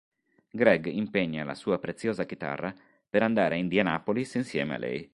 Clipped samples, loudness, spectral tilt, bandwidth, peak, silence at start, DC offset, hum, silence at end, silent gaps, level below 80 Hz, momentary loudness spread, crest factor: under 0.1%; -28 LUFS; -6.5 dB/octave; 11.5 kHz; -6 dBFS; 0.55 s; under 0.1%; none; 0.1 s; none; -64 dBFS; 10 LU; 22 dB